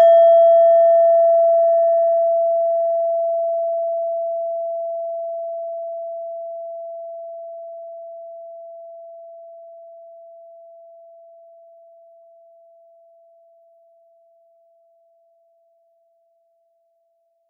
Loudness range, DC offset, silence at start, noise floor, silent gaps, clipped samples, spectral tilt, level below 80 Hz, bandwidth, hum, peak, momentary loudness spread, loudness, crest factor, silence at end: 25 LU; under 0.1%; 0 s; -66 dBFS; none; under 0.1%; -2.5 dB/octave; under -90 dBFS; 3.5 kHz; none; -6 dBFS; 26 LU; -17 LUFS; 14 dB; 7.5 s